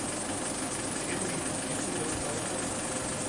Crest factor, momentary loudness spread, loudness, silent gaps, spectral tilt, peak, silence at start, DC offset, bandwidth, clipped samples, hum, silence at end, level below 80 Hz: 14 dB; 1 LU; -32 LUFS; none; -3 dB/octave; -20 dBFS; 0 s; under 0.1%; 12 kHz; under 0.1%; none; 0 s; -54 dBFS